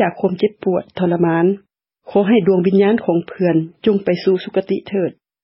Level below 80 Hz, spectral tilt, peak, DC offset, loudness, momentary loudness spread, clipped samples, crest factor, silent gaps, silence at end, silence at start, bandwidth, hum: -60 dBFS; -12 dB/octave; -2 dBFS; under 0.1%; -17 LUFS; 7 LU; under 0.1%; 14 dB; none; 0.35 s; 0 s; 5.8 kHz; none